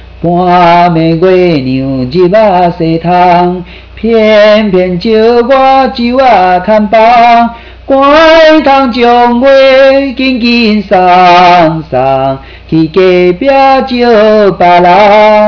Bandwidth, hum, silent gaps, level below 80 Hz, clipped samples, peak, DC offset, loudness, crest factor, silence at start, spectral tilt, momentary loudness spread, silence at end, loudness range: 5.4 kHz; none; none; -32 dBFS; under 0.1%; 0 dBFS; under 0.1%; -5 LUFS; 4 dB; 0 s; -7 dB/octave; 8 LU; 0 s; 2 LU